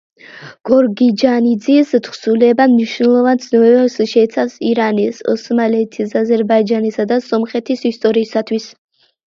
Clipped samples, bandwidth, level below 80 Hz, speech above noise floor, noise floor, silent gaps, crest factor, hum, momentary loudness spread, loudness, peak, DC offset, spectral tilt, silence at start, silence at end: under 0.1%; 7.4 kHz; -62 dBFS; 24 dB; -37 dBFS; none; 14 dB; none; 7 LU; -14 LUFS; 0 dBFS; under 0.1%; -6 dB/octave; 0.35 s; 0.6 s